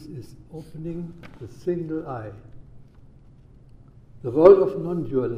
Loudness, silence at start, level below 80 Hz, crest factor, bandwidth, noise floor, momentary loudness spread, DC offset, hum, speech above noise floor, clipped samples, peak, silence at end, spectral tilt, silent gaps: -21 LUFS; 0 s; -50 dBFS; 22 dB; 6 kHz; -49 dBFS; 27 LU; under 0.1%; none; 27 dB; under 0.1%; -2 dBFS; 0 s; -9.5 dB/octave; none